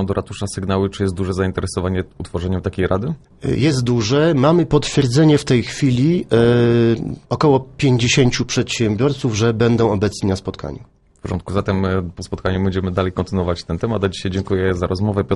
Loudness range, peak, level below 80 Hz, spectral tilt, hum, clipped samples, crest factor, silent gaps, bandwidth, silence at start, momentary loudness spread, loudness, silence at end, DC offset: 6 LU; -2 dBFS; -40 dBFS; -6 dB/octave; none; under 0.1%; 16 dB; none; 11.5 kHz; 0 s; 11 LU; -18 LUFS; 0 s; under 0.1%